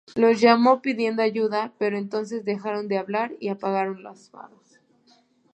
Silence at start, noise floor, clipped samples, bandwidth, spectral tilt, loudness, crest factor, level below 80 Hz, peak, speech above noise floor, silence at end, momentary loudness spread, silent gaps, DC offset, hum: 0.15 s; -60 dBFS; under 0.1%; 8.6 kHz; -6 dB/octave; -23 LUFS; 22 dB; -74 dBFS; -2 dBFS; 37 dB; 1.1 s; 12 LU; none; under 0.1%; none